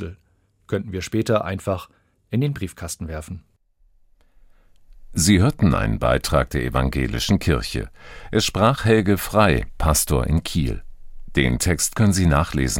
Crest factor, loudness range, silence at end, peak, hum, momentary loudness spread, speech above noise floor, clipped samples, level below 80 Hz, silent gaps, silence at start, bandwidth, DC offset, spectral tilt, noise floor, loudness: 18 dB; 7 LU; 0 s; -2 dBFS; none; 13 LU; 42 dB; under 0.1%; -32 dBFS; none; 0 s; 16.5 kHz; under 0.1%; -5 dB/octave; -62 dBFS; -21 LUFS